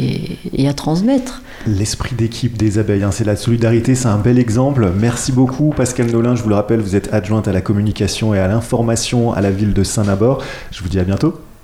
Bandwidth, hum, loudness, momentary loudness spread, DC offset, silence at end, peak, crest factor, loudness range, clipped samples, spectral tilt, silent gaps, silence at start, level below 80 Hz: 14 kHz; none; -16 LUFS; 6 LU; under 0.1%; 0.15 s; -2 dBFS; 12 dB; 2 LU; under 0.1%; -6 dB/octave; none; 0 s; -34 dBFS